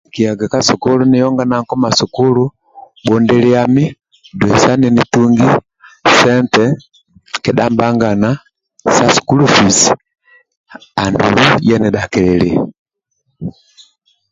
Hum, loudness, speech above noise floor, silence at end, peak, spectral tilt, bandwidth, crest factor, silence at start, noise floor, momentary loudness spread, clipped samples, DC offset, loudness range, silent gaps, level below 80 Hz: none; -12 LUFS; 56 dB; 0.8 s; 0 dBFS; -4.5 dB/octave; 7.8 kHz; 12 dB; 0.15 s; -67 dBFS; 11 LU; under 0.1%; under 0.1%; 3 LU; 10.57-10.64 s, 12.79-12.86 s; -42 dBFS